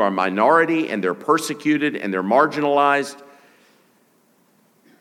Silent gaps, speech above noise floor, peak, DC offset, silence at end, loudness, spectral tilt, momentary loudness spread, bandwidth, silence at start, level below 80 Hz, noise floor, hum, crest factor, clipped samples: none; 41 dB; -2 dBFS; under 0.1%; 1.75 s; -19 LUFS; -5 dB/octave; 7 LU; 15.5 kHz; 0 s; -82 dBFS; -59 dBFS; none; 18 dB; under 0.1%